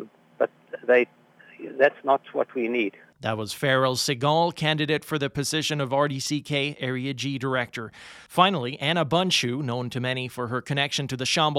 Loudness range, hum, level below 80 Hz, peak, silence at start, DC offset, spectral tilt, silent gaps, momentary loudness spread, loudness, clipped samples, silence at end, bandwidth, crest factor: 2 LU; none; -64 dBFS; -2 dBFS; 0 s; under 0.1%; -4.5 dB/octave; none; 9 LU; -25 LUFS; under 0.1%; 0 s; 16.5 kHz; 22 dB